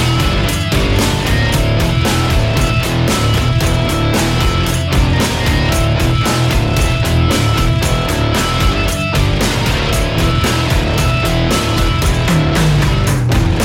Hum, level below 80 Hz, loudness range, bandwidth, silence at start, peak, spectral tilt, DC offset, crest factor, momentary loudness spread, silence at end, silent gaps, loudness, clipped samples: none; -20 dBFS; 1 LU; 16.5 kHz; 0 s; -2 dBFS; -5 dB/octave; under 0.1%; 10 dB; 2 LU; 0 s; none; -14 LUFS; under 0.1%